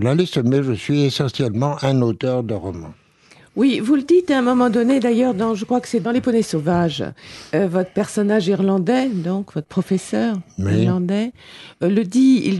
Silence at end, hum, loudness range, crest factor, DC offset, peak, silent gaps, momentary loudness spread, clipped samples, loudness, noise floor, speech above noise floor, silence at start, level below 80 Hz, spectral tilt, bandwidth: 0 s; none; 3 LU; 14 dB; under 0.1%; -6 dBFS; none; 9 LU; under 0.1%; -19 LUFS; -50 dBFS; 32 dB; 0 s; -54 dBFS; -7 dB/octave; 12 kHz